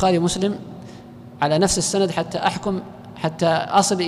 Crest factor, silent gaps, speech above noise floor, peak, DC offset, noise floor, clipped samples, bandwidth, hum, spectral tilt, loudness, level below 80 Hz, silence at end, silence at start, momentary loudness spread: 14 dB; none; 20 dB; -6 dBFS; under 0.1%; -40 dBFS; under 0.1%; 15.5 kHz; none; -4 dB/octave; -21 LUFS; -46 dBFS; 0 s; 0 s; 20 LU